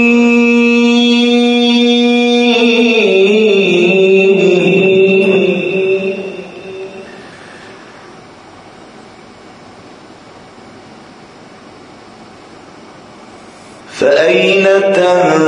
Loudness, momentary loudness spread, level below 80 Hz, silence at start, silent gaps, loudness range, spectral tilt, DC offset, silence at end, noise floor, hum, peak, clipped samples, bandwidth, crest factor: -9 LUFS; 19 LU; -60 dBFS; 0 s; none; 17 LU; -5 dB/octave; under 0.1%; 0 s; -36 dBFS; none; 0 dBFS; under 0.1%; 10.5 kHz; 12 dB